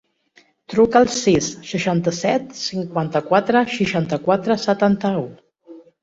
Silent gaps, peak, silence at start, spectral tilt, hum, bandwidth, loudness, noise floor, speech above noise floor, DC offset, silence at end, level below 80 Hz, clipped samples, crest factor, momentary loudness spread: none; -2 dBFS; 0.7 s; -5 dB/octave; none; 8 kHz; -19 LUFS; -56 dBFS; 38 dB; under 0.1%; 0.25 s; -52 dBFS; under 0.1%; 18 dB; 9 LU